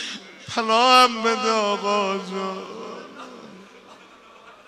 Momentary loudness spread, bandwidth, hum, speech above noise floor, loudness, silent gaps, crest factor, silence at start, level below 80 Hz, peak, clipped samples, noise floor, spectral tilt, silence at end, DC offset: 23 LU; 15 kHz; none; 28 dB; -20 LUFS; none; 20 dB; 0 s; -72 dBFS; -2 dBFS; under 0.1%; -48 dBFS; -2.5 dB/octave; 0.15 s; under 0.1%